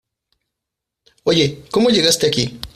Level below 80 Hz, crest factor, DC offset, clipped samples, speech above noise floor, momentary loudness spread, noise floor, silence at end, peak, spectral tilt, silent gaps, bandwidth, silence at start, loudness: -48 dBFS; 16 dB; under 0.1%; under 0.1%; 66 dB; 7 LU; -82 dBFS; 0.1 s; -2 dBFS; -4 dB/octave; none; 15.5 kHz; 1.25 s; -16 LUFS